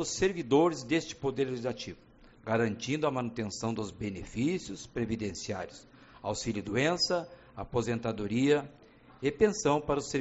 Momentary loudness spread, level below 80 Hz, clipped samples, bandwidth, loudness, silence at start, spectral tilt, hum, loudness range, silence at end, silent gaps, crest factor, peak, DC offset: 12 LU; -56 dBFS; under 0.1%; 8 kHz; -31 LUFS; 0 s; -4.5 dB/octave; none; 5 LU; 0 s; none; 20 dB; -12 dBFS; under 0.1%